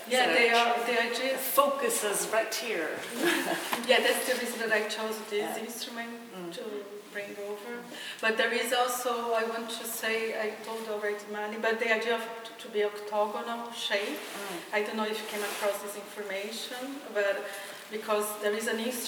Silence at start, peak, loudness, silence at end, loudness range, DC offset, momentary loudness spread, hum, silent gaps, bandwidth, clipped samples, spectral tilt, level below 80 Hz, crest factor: 0 s; -8 dBFS; -30 LUFS; 0 s; 6 LU; under 0.1%; 13 LU; none; none; over 20 kHz; under 0.1%; -1.5 dB/octave; -88 dBFS; 22 dB